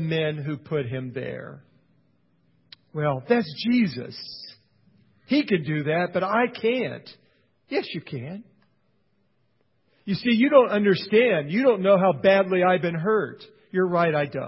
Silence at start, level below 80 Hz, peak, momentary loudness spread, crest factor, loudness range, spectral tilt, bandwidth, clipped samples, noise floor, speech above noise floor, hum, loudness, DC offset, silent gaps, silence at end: 0 s; -66 dBFS; -4 dBFS; 17 LU; 20 dB; 11 LU; -10.5 dB/octave; 5.8 kHz; under 0.1%; -70 dBFS; 47 dB; none; -23 LUFS; under 0.1%; none; 0 s